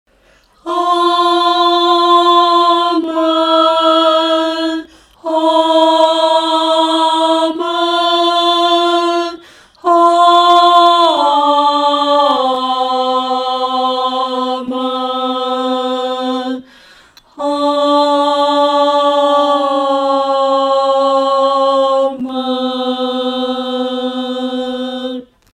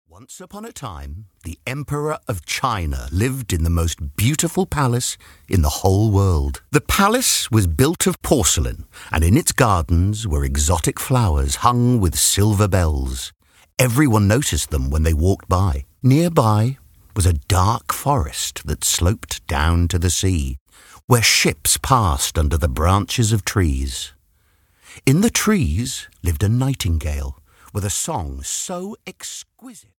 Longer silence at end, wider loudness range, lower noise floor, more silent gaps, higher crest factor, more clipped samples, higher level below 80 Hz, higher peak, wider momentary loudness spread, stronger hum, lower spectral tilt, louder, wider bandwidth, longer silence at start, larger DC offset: about the same, 0.3 s vs 0.2 s; about the same, 6 LU vs 5 LU; second, -51 dBFS vs -60 dBFS; second, none vs 20.61-20.66 s, 21.04-21.08 s; second, 12 dB vs 18 dB; neither; second, -60 dBFS vs -28 dBFS; about the same, 0 dBFS vs 0 dBFS; second, 10 LU vs 14 LU; neither; second, -2.5 dB/octave vs -4.5 dB/octave; first, -12 LUFS vs -19 LUFS; second, 12 kHz vs 18.5 kHz; first, 0.65 s vs 0.3 s; neither